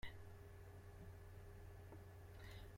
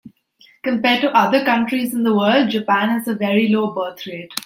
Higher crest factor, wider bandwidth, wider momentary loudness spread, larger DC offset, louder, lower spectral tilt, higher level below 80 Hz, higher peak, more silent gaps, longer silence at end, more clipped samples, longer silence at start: about the same, 18 dB vs 18 dB; about the same, 16.5 kHz vs 16.5 kHz; second, 2 LU vs 11 LU; neither; second, -60 LUFS vs -17 LUFS; about the same, -5.5 dB/octave vs -5 dB/octave; about the same, -64 dBFS vs -66 dBFS; second, -38 dBFS vs 0 dBFS; neither; about the same, 0 s vs 0.05 s; neither; about the same, 0 s vs 0.05 s